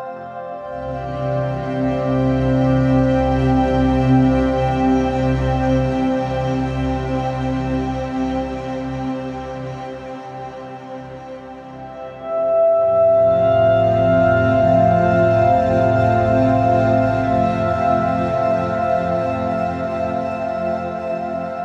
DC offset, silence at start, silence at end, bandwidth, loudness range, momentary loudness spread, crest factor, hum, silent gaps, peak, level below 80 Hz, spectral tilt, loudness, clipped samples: under 0.1%; 0 s; 0 s; 7.8 kHz; 11 LU; 16 LU; 14 dB; none; none; -4 dBFS; -34 dBFS; -8.5 dB/octave; -18 LUFS; under 0.1%